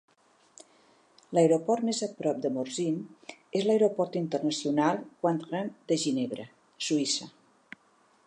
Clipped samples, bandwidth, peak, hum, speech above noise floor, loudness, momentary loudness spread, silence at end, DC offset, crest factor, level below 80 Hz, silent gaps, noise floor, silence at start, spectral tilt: under 0.1%; 11 kHz; -12 dBFS; none; 37 dB; -29 LUFS; 11 LU; 1 s; under 0.1%; 18 dB; -82 dBFS; none; -65 dBFS; 1.3 s; -4.5 dB/octave